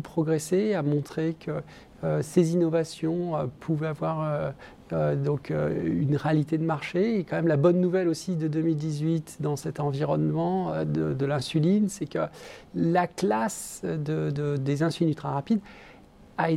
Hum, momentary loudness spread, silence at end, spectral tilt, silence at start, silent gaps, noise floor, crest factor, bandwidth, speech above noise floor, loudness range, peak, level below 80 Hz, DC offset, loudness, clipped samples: none; 8 LU; 0 s; -7 dB/octave; 0 s; none; -51 dBFS; 18 dB; 14 kHz; 25 dB; 3 LU; -8 dBFS; -58 dBFS; under 0.1%; -27 LUFS; under 0.1%